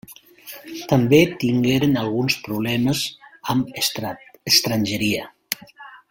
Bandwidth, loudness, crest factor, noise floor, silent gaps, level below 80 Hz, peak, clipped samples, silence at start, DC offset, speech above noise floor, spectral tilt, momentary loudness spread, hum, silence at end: 17 kHz; -20 LUFS; 22 dB; -43 dBFS; none; -54 dBFS; 0 dBFS; under 0.1%; 0.1 s; under 0.1%; 24 dB; -4.5 dB/octave; 17 LU; none; 0.15 s